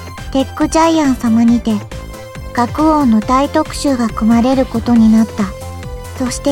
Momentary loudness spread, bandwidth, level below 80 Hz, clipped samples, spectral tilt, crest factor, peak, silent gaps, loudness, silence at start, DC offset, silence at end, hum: 17 LU; 15 kHz; -30 dBFS; under 0.1%; -5.5 dB/octave; 12 dB; 0 dBFS; none; -13 LUFS; 0 s; under 0.1%; 0 s; none